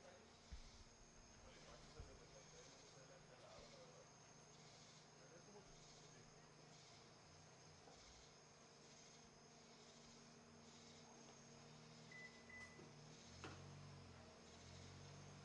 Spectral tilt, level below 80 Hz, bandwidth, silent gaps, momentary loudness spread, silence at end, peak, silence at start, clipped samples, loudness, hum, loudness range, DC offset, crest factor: -3.5 dB/octave; -74 dBFS; 10.5 kHz; none; 6 LU; 0 s; -42 dBFS; 0 s; under 0.1%; -63 LUFS; none; 4 LU; under 0.1%; 22 dB